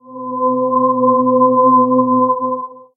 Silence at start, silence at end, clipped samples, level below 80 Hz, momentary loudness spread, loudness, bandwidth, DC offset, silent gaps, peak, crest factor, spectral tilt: 0.1 s; 0.15 s; under 0.1%; -64 dBFS; 9 LU; -13 LUFS; 1.3 kHz; under 0.1%; none; -2 dBFS; 12 dB; -17 dB/octave